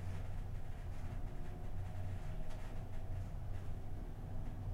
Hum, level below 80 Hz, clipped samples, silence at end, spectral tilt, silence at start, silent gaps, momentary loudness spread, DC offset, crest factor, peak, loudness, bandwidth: none; -44 dBFS; under 0.1%; 0 s; -7.5 dB/octave; 0 s; none; 3 LU; under 0.1%; 10 dB; -30 dBFS; -48 LUFS; 10.5 kHz